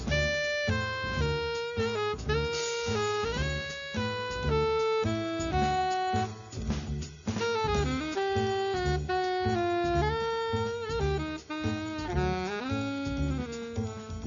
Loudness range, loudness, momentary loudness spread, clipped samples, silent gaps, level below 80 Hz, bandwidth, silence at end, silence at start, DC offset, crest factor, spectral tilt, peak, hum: 2 LU; -31 LUFS; 7 LU; under 0.1%; none; -42 dBFS; 7.4 kHz; 0 s; 0 s; under 0.1%; 16 dB; -5 dB/octave; -16 dBFS; none